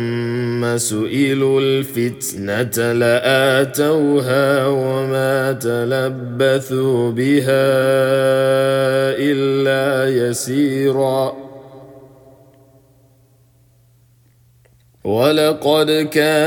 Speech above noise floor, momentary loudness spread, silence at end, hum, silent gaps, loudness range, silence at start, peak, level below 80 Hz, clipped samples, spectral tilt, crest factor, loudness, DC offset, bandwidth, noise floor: 37 dB; 6 LU; 0 s; none; none; 7 LU; 0 s; -2 dBFS; -62 dBFS; under 0.1%; -5 dB/octave; 14 dB; -16 LUFS; under 0.1%; 19 kHz; -53 dBFS